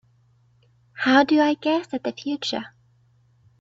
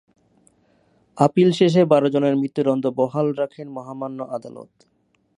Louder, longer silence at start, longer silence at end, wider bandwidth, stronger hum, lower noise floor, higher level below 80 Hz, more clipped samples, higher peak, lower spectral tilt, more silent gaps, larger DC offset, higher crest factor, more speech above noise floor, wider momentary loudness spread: about the same, -22 LUFS vs -20 LUFS; second, 0.95 s vs 1.15 s; first, 0.95 s vs 0.75 s; second, 7.8 kHz vs 11 kHz; neither; about the same, -60 dBFS vs -61 dBFS; about the same, -68 dBFS vs -68 dBFS; neither; about the same, -4 dBFS vs -2 dBFS; second, -4 dB/octave vs -7.5 dB/octave; neither; neither; about the same, 20 dB vs 20 dB; about the same, 39 dB vs 41 dB; second, 13 LU vs 16 LU